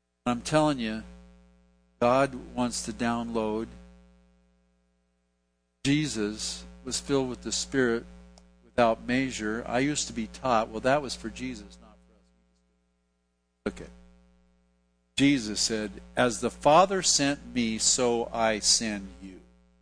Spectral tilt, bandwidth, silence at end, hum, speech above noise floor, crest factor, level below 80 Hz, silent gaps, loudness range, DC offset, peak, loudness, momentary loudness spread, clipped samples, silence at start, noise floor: -3.5 dB/octave; 10.5 kHz; 0.45 s; 60 Hz at -50 dBFS; 48 dB; 22 dB; -52 dBFS; none; 10 LU; under 0.1%; -8 dBFS; -27 LUFS; 15 LU; under 0.1%; 0.25 s; -75 dBFS